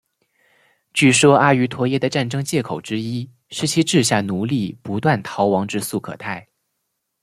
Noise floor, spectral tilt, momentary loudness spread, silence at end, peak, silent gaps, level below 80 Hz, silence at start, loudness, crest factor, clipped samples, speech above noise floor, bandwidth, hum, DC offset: -75 dBFS; -4.5 dB/octave; 15 LU; 0.8 s; -2 dBFS; none; -58 dBFS; 0.95 s; -19 LUFS; 18 dB; under 0.1%; 56 dB; 15 kHz; none; under 0.1%